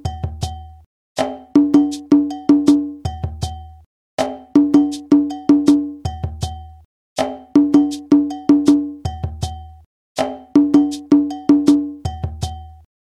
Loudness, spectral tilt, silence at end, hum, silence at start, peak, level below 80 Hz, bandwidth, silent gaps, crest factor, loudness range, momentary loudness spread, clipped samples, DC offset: -17 LUFS; -7 dB/octave; 0.4 s; none; 0.05 s; 0 dBFS; -38 dBFS; 11 kHz; 0.86-1.15 s, 3.86-4.18 s, 6.85-7.16 s, 9.86-10.15 s; 16 dB; 0 LU; 15 LU; under 0.1%; under 0.1%